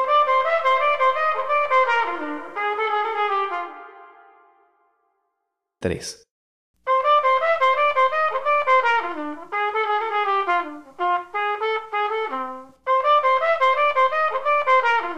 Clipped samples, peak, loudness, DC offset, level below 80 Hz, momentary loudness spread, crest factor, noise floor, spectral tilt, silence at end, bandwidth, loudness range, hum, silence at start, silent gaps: under 0.1%; -8 dBFS; -20 LUFS; 0.3%; -62 dBFS; 12 LU; 14 dB; -79 dBFS; -3.5 dB/octave; 0 s; 11.5 kHz; 9 LU; none; 0 s; 6.31-6.74 s